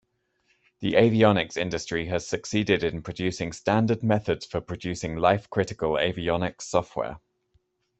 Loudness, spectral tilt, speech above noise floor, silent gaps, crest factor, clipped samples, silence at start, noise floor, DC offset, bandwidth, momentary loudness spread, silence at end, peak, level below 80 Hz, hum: -26 LUFS; -5.5 dB/octave; 46 dB; none; 22 dB; under 0.1%; 0.8 s; -71 dBFS; under 0.1%; 8.4 kHz; 11 LU; 0.8 s; -4 dBFS; -54 dBFS; none